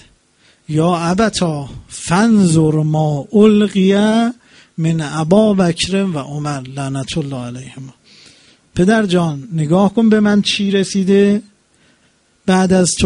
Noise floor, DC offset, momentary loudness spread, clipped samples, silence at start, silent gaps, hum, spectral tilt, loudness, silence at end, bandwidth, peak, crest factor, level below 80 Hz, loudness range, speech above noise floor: -56 dBFS; under 0.1%; 13 LU; under 0.1%; 0.7 s; none; none; -5.5 dB/octave; -14 LUFS; 0 s; 11 kHz; 0 dBFS; 14 dB; -44 dBFS; 6 LU; 42 dB